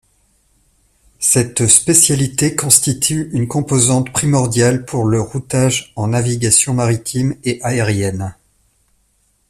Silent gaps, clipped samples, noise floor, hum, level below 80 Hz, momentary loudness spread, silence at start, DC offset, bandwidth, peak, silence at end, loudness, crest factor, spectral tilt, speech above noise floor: none; under 0.1%; -60 dBFS; none; -46 dBFS; 9 LU; 1.2 s; under 0.1%; 16 kHz; 0 dBFS; 1.15 s; -14 LUFS; 16 dB; -4 dB/octave; 45 dB